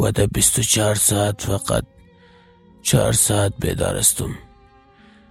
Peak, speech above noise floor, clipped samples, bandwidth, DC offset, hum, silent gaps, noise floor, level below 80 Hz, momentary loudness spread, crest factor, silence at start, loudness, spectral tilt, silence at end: -2 dBFS; 32 dB; under 0.1%; 16.5 kHz; under 0.1%; none; none; -50 dBFS; -38 dBFS; 9 LU; 20 dB; 0 s; -18 LUFS; -3.5 dB/octave; 0.9 s